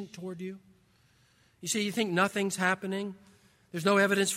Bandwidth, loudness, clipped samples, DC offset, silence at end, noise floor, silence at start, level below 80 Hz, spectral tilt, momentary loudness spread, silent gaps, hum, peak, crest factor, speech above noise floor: 16 kHz; -29 LUFS; under 0.1%; under 0.1%; 0 s; -65 dBFS; 0 s; -76 dBFS; -3.5 dB/octave; 17 LU; none; none; -12 dBFS; 20 dB; 36 dB